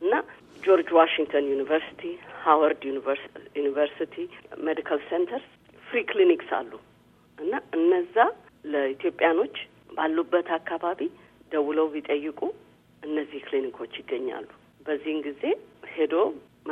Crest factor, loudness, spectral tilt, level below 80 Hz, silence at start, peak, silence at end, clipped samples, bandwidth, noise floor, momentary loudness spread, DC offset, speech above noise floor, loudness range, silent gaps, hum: 22 dB; -26 LUFS; -6 dB/octave; -70 dBFS; 0 s; -4 dBFS; 0 s; under 0.1%; 4.1 kHz; -58 dBFS; 15 LU; under 0.1%; 32 dB; 7 LU; none; 60 Hz at -65 dBFS